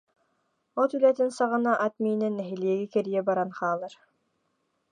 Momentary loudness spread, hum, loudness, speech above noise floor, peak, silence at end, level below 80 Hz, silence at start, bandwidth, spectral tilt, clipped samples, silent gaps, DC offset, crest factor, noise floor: 7 LU; none; -27 LUFS; 49 dB; -10 dBFS; 0.95 s; -84 dBFS; 0.75 s; 10 kHz; -6.5 dB/octave; under 0.1%; none; under 0.1%; 18 dB; -75 dBFS